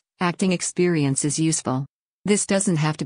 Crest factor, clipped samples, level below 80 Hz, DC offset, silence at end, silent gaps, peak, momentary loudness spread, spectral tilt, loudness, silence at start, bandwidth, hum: 16 dB; under 0.1%; -62 dBFS; under 0.1%; 0 s; 1.89-2.24 s; -8 dBFS; 8 LU; -4.5 dB/octave; -22 LUFS; 0.2 s; 10.5 kHz; none